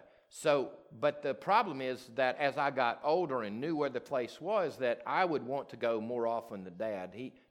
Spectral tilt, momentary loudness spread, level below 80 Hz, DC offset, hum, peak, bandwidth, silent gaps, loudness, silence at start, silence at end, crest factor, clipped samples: -5.5 dB/octave; 9 LU; -80 dBFS; under 0.1%; none; -14 dBFS; 15 kHz; none; -34 LUFS; 0.35 s; 0.2 s; 20 dB; under 0.1%